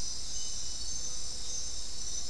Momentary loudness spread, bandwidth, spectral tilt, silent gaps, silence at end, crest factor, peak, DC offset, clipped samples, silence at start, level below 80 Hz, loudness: 2 LU; 12 kHz; -0.5 dB/octave; none; 0 s; 12 dB; -22 dBFS; 3%; under 0.1%; 0 s; -48 dBFS; -36 LUFS